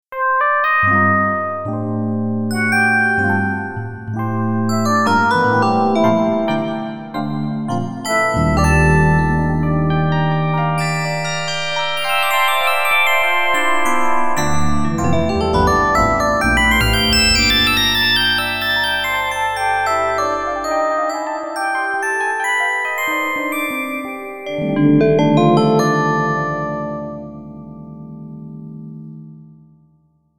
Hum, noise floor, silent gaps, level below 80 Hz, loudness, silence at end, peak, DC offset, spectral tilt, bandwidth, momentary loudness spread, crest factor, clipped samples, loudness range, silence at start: none; -57 dBFS; none; -32 dBFS; -16 LUFS; 0 s; -2 dBFS; under 0.1%; -4.5 dB/octave; over 20 kHz; 13 LU; 16 dB; under 0.1%; 5 LU; 0 s